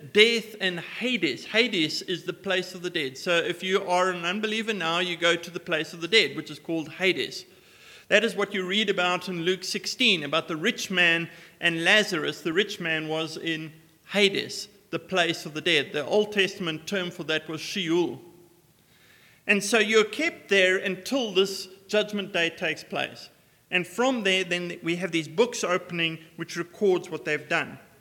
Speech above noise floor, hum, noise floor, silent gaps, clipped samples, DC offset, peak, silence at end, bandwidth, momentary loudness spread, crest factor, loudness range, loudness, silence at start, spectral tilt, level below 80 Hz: 33 dB; none; -60 dBFS; none; under 0.1%; under 0.1%; -2 dBFS; 0.2 s; 18 kHz; 11 LU; 24 dB; 4 LU; -25 LUFS; 0 s; -3.5 dB/octave; -76 dBFS